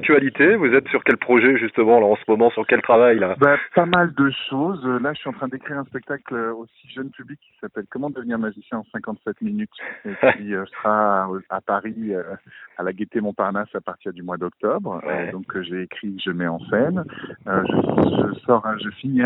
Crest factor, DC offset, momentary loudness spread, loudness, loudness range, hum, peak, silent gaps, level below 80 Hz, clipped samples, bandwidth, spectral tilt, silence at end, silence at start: 20 dB; under 0.1%; 16 LU; -20 LUFS; 13 LU; none; 0 dBFS; none; -58 dBFS; under 0.1%; 4.1 kHz; -9.5 dB/octave; 0 s; 0 s